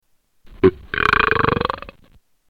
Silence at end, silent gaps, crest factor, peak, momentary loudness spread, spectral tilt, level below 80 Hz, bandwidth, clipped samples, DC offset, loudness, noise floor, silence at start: 0.6 s; none; 20 dB; 0 dBFS; 9 LU; -7 dB/octave; -38 dBFS; 10 kHz; under 0.1%; under 0.1%; -18 LUFS; -53 dBFS; 0.45 s